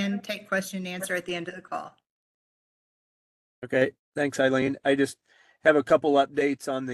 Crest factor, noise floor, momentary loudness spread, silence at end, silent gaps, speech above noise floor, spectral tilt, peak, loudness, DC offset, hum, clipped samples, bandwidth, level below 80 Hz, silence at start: 22 dB; under -90 dBFS; 13 LU; 0 s; 2.10-3.62 s, 3.99-4.12 s; over 64 dB; -5 dB/octave; -6 dBFS; -26 LUFS; under 0.1%; none; under 0.1%; 12.5 kHz; -68 dBFS; 0 s